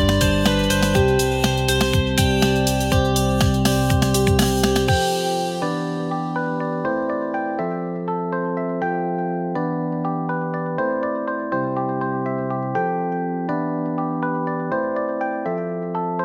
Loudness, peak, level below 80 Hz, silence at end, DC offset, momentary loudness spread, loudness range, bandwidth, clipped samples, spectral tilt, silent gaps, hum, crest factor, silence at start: -21 LUFS; -6 dBFS; -34 dBFS; 0 s; under 0.1%; 7 LU; 6 LU; 17.5 kHz; under 0.1%; -5 dB/octave; none; none; 16 dB; 0 s